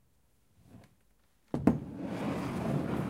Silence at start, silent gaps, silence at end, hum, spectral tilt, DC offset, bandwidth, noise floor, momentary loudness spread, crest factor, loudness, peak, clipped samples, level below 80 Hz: 0.7 s; none; 0 s; none; -8 dB/octave; under 0.1%; 16 kHz; -71 dBFS; 9 LU; 26 dB; -34 LUFS; -10 dBFS; under 0.1%; -54 dBFS